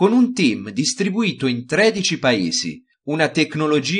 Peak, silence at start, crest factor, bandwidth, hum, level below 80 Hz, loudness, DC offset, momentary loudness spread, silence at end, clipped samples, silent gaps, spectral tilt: -2 dBFS; 0 s; 16 dB; 10 kHz; none; -62 dBFS; -19 LUFS; under 0.1%; 7 LU; 0 s; under 0.1%; none; -4 dB/octave